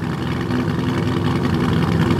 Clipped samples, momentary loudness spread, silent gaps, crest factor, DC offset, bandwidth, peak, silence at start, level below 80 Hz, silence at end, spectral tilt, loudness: under 0.1%; 4 LU; none; 14 dB; under 0.1%; 14.5 kHz; -6 dBFS; 0 s; -36 dBFS; 0 s; -7.5 dB/octave; -20 LUFS